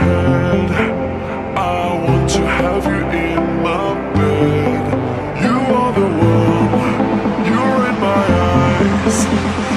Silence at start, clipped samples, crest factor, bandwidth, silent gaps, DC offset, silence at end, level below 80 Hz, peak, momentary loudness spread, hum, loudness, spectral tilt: 0 s; under 0.1%; 12 dB; 13 kHz; none; under 0.1%; 0 s; -32 dBFS; -2 dBFS; 5 LU; none; -15 LUFS; -6.5 dB/octave